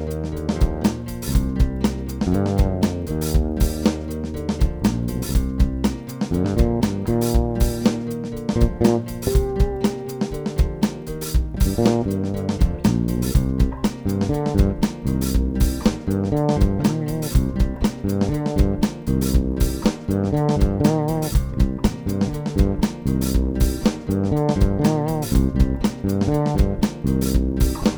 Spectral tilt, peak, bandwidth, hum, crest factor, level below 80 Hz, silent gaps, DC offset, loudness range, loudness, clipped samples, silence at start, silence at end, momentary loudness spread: -7 dB/octave; -2 dBFS; over 20 kHz; none; 18 dB; -24 dBFS; none; under 0.1%; 2 LU; -22 LUFS; under 0.1%; 0 s; 0 s; 5 LU